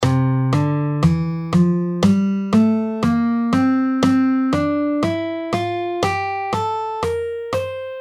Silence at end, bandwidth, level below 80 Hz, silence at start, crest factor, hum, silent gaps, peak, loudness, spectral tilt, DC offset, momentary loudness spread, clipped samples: 0 s; 13 kHz; -46 dBFS; 0 s; 16 dB; none; none; -2 dBFS; -19 LUFS; -7.5 dB/octave; under 0.1%; 7 LU; under 0.1%